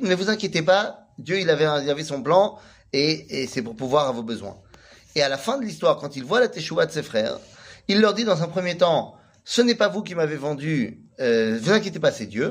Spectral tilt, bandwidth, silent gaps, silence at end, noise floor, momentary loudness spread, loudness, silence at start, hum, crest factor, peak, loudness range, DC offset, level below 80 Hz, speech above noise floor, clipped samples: -4.5 dB/octave; 15.5 kHz; none; 0 s; -50 dBFS; 9 LU; -23 LUFS; 0 s; none; 18 dB; -4 dBFS; 2 LU; under 0.1%; -62 dBFS; 28 dB; under 0.1%